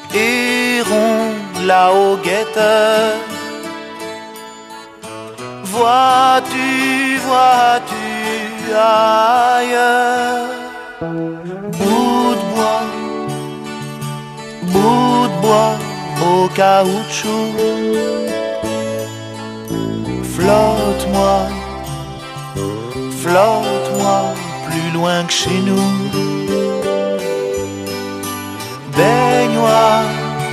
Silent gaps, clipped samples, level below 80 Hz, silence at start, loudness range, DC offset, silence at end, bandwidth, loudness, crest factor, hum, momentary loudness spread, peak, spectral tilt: none; under 0.1%; -42 dBFS; 0 s; 5 LU; under 0.1%; 0 s; 14 kHz; -15 LUFS; 16 dB; none; 15 LU; 0 dBFS; -4.5 dB/octave